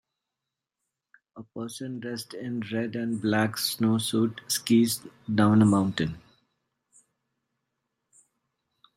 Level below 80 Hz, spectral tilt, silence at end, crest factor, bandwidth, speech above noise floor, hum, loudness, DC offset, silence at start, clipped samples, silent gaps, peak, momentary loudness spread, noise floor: -64 dBFS; -5 dB/octave; 2.75 s; 18 dB; 16 kHz; 61 dB; none; -26 LUFS; under 0.1%; 1.35 s; under 0.1%; none; -10 dBFS; 14 LU; -87 dBFS